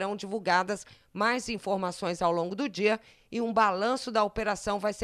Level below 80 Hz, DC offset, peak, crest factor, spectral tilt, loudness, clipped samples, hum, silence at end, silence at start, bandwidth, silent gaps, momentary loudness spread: -58 dBFS; under 0.1%; -12 dBFS; 18 dB; -4.5 dB/octave; -29 LUFS; under 0.1%; none; 0 s; 0 s; 14 kHz; none; 8 LU